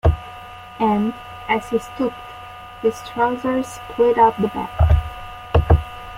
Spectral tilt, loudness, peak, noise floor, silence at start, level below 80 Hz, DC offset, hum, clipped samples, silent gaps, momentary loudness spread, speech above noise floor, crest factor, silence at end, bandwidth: -7.5 dB/octave; -20 LUFS; -2 dBFS; -37 dBFS; 0.05 s; -28 dBFS; under 0.1%; none; under 0.1%; none; 19 LU; 18 dB; 18 dB; 0 s; 15 kHz